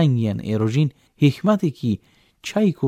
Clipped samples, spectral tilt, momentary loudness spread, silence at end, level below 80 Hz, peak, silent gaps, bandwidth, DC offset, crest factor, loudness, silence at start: under 0.1%; -7.5 dB/octave; 8 LU; 0 s; -58 dBFS; -4 dBFS; none; 13.5 kHz; under 0.1%; 16 dB; -21 LUFS; 0 s